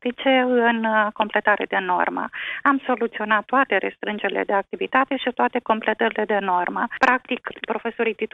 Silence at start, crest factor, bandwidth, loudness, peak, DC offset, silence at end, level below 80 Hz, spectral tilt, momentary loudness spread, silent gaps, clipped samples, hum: 0.05 s; 20 dB; 7.8 kHz; -21 LUFS; -2 dBFS; under 0.1%; 0.1 s; -66 dBFS; -5.5 dB/octave; 7 LU; none; under 0.1%; none